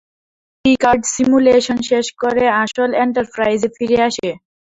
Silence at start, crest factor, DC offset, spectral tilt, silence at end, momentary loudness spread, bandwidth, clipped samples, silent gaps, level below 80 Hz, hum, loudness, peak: 0.65 s; 14 dB; under 0.1%; -3.5 dB/octave; 0.3 s; 6 LU; 8 kHz; under 0.1%; none; -48 dBFS; none; -15 LUFS; -2 dBFS